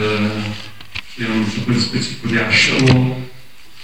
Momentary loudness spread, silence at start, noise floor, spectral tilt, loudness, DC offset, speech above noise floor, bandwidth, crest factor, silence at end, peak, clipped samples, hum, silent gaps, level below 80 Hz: 17 LU; 0 s; -44 dBFS; -5 dB/octave; -16 LUFS; 2%; 28 dB; 12 kHz; 16 dB; 0 s; -2 dBFS; under 0.1%; none; none; -44 dBFS